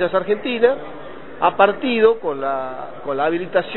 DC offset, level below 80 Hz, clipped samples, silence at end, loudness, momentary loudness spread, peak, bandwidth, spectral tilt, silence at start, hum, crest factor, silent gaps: 1%; -56 dBFS; under 0.1%; 0 s; -19 LUFS; 14 LU; 0 dBFS; 4.2 kHz; -9 dB/octave; 0 s; none; 20 dB; none